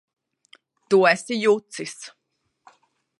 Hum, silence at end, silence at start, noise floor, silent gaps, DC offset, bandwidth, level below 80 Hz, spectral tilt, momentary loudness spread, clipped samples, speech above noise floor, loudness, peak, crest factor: none; 1.1 s; 0.9 s; -63 dBFS; none; under 0.1%; 11.5 kHz; -78 dBFS; -4 dB/octave; 20 LU; under 0.1%; 42 dB; -21 LUFS; -2 dBFS; 22 dB